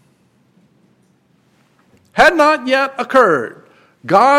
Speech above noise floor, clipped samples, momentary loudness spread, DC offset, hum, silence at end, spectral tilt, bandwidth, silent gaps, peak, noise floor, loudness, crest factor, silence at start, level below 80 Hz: 44 dB; under 0.1%; 15 LU; under 0.1%; none; 0 s; -4.5 dB/octave; 16 kHz; none; 0 dBFS; -56 dBFS; -13 LUFS; 16 dB; 2.15 s; -50 dBFS